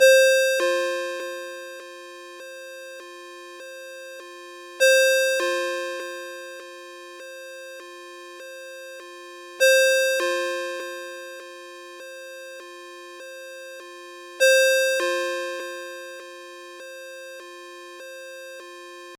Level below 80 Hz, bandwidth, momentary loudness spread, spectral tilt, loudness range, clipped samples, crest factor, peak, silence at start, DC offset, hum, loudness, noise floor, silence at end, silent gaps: -90 dBFS; 17 kHz; 23 LU; 2 dB/octave; 15 LU; under 0.1%; 20 dB; -4 dBFS; 0 s; under 0.1%; none; -21 LUFS; -41 dBFS; 0.05 s; none